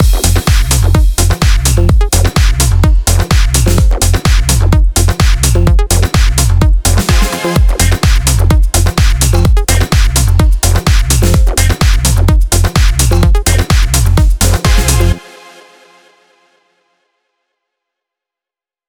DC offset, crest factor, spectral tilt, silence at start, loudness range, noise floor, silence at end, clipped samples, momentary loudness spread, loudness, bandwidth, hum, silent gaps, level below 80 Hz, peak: 0.2%; 8 dB; -4.5 dB/octave; 0 s; 3 LU; -88 dBFS; 3.7 s; under 0.1%; 1 LU; -10 LUFS; 19.5 kHz; none; none; -10 dBFS; 0 dBFS